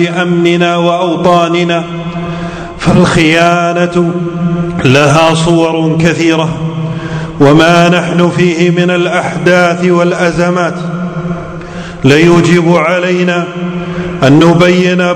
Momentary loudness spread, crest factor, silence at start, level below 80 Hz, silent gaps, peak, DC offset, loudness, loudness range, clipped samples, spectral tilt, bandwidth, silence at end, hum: 12 LU; 8 dB; 0 s; -36 dBFS; none; 0 dBFS; under 0.1%; -9 LUFS; 2 LU; 3%; -6 dB/octave; 9.8 kHz; 0 s; none